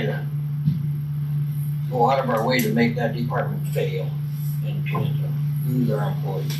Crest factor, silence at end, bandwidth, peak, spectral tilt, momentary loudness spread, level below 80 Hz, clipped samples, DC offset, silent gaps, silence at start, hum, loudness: 16 dB; 0 s; 14 kHz; -8 dBFS; -7 dB/octave; 7 LU; -54 dBFS; under 0.1%; under 0.1%; none; 0 s; none; -23 LUFS